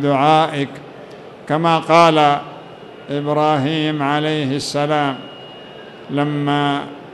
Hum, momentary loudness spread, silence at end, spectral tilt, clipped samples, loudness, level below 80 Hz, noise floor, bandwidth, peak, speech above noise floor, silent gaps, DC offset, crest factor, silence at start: none; 24 LU; 0 s; -6 dB/octave; under 0.1%; -17 LUFS; -62 dBFS; -36 dBFS; 12 kHz; 0 dBFS; 20 dB; none; under 0.1%; 16 dB; 0 s